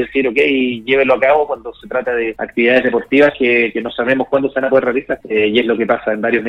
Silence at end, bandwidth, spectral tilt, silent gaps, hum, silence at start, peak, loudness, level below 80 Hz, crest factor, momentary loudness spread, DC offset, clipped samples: 0 s; 6.2 kHz; -6.5 dB/octave; none; none; 0 s; 0 dBFS; -15 LUFS; -50 dBFS; 14 dB; 7 LU; under 0.1%; under 0.1%